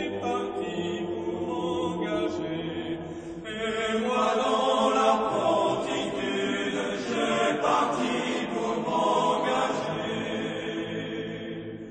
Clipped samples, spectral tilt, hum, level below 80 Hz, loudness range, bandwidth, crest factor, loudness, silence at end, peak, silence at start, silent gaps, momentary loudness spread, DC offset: under 0.1%; -4.5 dB/octave; none; -60 dBFS; 5 LU; 9.4 kHz; 18 dB; -27 LUFS; 0 s; -10 dBFS; 0 s; none; 9 LU; under 0.1%